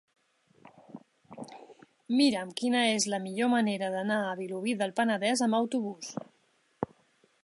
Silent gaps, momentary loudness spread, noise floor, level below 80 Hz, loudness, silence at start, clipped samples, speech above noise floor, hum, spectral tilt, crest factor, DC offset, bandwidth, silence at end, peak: none; 17 LU; -70 dBFS; -76 dBFS; -29 LUFS; 0.95 s; under 0.1%; 41 dB; none; -3.5 dB/octave; 18 dB; under 0.1%; 11.5 kHz; 0.6 s; -14 dBFS